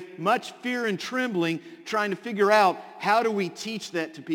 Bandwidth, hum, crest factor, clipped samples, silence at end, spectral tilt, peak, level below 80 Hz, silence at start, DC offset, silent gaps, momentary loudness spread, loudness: 17 kHz; none; 20 dB; under 0.1%; 0 s; -4.5 dB/octave; -6 dBFS; -76 dBFS; 0 s; under 0.1%; none; 10 LU; -26 LUFS